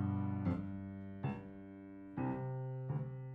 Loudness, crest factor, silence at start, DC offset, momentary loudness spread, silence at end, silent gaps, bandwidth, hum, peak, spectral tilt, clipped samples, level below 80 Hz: -42 LUFS; 16 dB; 0 s; under 0.1%; 14 LU; 0 s; none; 4.5 kHz; none; -24 dBFS; -11 dB/octave; under 0.1%; -66 dBFS